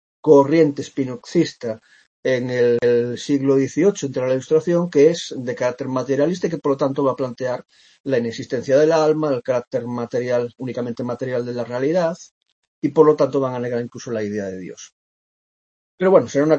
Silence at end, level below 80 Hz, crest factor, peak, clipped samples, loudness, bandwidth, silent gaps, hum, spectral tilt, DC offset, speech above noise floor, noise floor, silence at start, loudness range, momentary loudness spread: 0 s; -66 dBFS; 18 dB; 0 dBFS; under 0.1%; -20 LUFS; 8.2 kHz; 2.07-2.23 s, 8.00-8.04 s, 12.31-12.41 s, 12.52-12.82 s, 14.92-15.98 s; none; -6.5 dB/octave; under 0.1%; over 71 dB; under -90 dBFS; 0.25 s; 4 LU; 12 LU